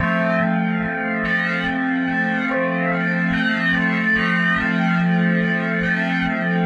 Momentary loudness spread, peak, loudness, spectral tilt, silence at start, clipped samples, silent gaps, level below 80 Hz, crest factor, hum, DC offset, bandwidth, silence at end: 3 LU; -6 dBFS; -19 LUFS; -7.5 dB/octave; 0 s; under 0.1%; none; -48 dBFS; 12 dB; none; under 0.1%; 7 kHz; 0 s